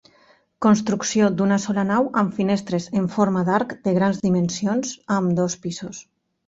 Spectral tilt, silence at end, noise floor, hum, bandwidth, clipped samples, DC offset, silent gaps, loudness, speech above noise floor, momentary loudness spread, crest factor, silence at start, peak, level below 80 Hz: -6 dB/octave; 0.45 s; -57 dBFS; none; 8 kHz; under 0.1%; under 0.1%; none; -21 LUFS; 36 dB; 6 LU; 16 dB; 0.6 s; -4 dBFS; -60 dBFS